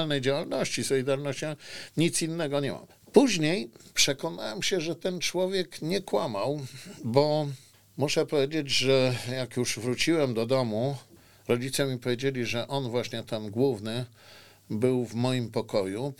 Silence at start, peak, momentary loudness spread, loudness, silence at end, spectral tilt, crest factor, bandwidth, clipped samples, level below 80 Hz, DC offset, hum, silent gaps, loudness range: 0 s; -4 dBFS; 10 LU; -28 LUFS; 0 s; -4.5 dB/octave; 24 dB; 18.5 kHz; under 0.1%; -62 dBFS; 0.3%; none; none; 4 LU